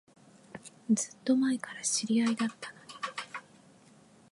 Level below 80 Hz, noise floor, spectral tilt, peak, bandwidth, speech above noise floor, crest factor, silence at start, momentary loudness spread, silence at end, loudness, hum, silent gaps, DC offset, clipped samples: -82 dBFS; -59 dBFS; -3 dB/octave; -16 dBFS; 11.5 kHz; 29 dB; 18 dB; 0.55 s; 18 LU; 0.9 s; -31 LUFS; none; none; under 0.1%; under 0.1%